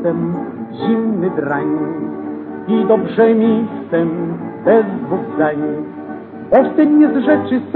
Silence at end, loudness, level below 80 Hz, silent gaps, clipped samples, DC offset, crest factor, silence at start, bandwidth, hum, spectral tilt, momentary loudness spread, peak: 0 s; -16 LUFS; -56 dBFS; none; under 0.1%; under 0.1%; 16 dB; 0 s; 4.3 kHz; none; -11 dB/octave; 14 LU; 0 dBFS